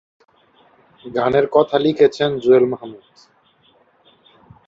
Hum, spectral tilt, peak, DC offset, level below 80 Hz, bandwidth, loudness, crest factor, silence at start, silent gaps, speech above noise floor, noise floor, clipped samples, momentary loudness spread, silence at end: none; -7 dB/octave; -2 dBFS; under 0.1%; -58 dBFS; 7.6 kHz; -16 LUFS; 18 dB; 1.05 s; none; 40 dB; -57 dBFS; under 0.1%; 12 LU; 1.7 s